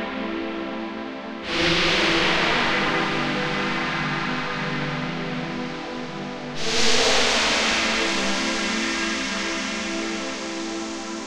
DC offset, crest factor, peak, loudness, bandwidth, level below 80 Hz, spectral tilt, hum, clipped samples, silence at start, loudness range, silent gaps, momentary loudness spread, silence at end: under 0.1%; 18 dB; -6 dBFS; -23 LUFS; 15.5 kHz; -46 dBFS; -2.5 dB/octave; none; under 0.1%; 0 s; 5 LU; none; 12 LU; 0 s